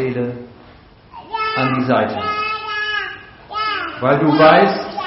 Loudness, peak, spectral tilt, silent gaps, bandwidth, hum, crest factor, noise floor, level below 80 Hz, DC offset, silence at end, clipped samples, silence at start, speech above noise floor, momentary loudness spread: -16 LUFS; 0 dBFS; -3.5 dB/octave; none; 6 kHz; none; 18 dB; -44 dBFS; -52 dBFS; under 0.1%; 0 s; under 0.1%; 0 s; 30 dB; 18 LU